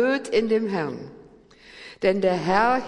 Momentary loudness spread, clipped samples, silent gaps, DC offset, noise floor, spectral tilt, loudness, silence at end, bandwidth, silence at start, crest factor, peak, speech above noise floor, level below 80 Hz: 21 LU; under 0.1%; none; under 0.1%; -50 dBFS; -6 dB/octave; -23 LUFS; 0 s; 11 kHz; 0 s; 16 dB; -8 dBFS; 28 dB; -56 dBFS